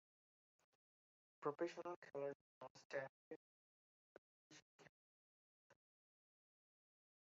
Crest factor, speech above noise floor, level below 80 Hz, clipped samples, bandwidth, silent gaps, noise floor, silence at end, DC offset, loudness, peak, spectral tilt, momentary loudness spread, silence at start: 24 dB; over 39 dB; under -90 dBFS; under 0.1%; 7.4 kHz; 1.96-2.02 s, 2.35-2.61 s, 2.70-2.75 s, 2.85-2.90 s, 3.09-4.50 s, 4.62-4.79 s, 4.89-5.70 s; under -90 dBFS; 1.55 s; under 0.1%; -51 LUFS; -32 dBFS; -4.5 dB/octave; 20 LU; 1.4 s